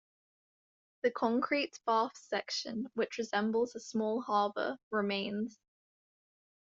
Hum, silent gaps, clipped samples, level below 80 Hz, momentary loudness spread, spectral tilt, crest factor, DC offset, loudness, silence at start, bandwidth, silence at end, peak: none; 4.83-4.91 s; under 0.1%; -80 dBFS; 6 LU; -2.5 dB/octave; 18 dB; under 0.1%; -34 LUFS; 1.05 s; 7.8 kHz; 1.1 s; -16 dBFS